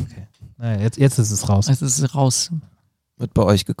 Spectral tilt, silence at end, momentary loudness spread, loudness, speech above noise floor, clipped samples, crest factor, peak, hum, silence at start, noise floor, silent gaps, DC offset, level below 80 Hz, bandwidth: -5 dB/octave; 0.05 s; 13 LU; -19 LUFS; 44 dB; under 0.1%; 16 dB; -2 dBFS; none; 0 s; -62 dBFS; none; under 0.1%; -44 dBFS; 15.5 kHz